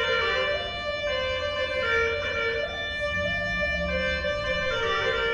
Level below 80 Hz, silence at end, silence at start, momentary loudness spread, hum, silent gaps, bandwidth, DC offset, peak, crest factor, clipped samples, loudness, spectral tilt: -42 dBFS; 0 s; 0 s; 5 LU; none; none; 9.8 kHz; under 0.1%; -14 dBFS; 14 dB; under 0.1%; -26 LUFS; -4 dB/octave